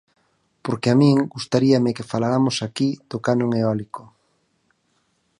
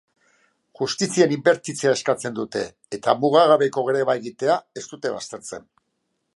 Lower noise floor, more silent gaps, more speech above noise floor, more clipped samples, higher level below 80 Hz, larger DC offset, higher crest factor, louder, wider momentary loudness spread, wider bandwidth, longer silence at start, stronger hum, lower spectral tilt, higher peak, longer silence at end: second, -67 dBFS vs -74 dBFS; neither; second, 48 dB vs 53 dB; neither; first, -60 dBFS vs -68 dBFS; neither; about the same, 18 dB vs 20 dB; about the same, -20 LUFS vs -21 LUFS; second, 12 LU vs 15 LU; about the same, 11 kHz vs 11.5 kHz; second, 0.65 s vs 0.8 s; neither; first, -6.5 dB/octave vs -4 dB/octave; about the same, -4 dBFS vs -2 dBFS; first, 1.4 s vs 0.75 s